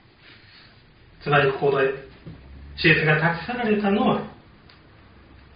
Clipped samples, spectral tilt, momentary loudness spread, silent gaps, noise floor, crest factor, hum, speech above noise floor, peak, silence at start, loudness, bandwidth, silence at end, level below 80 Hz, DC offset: under 0.1%; -4 dB/octave; 23 LU; none; -52 dBFS; 20 dB; none; 31 dB; -4 dBFS; 1.2 s; -21 LUFS; 5.2 kHz; 1.2 s; -50 dBFS; under 0.1%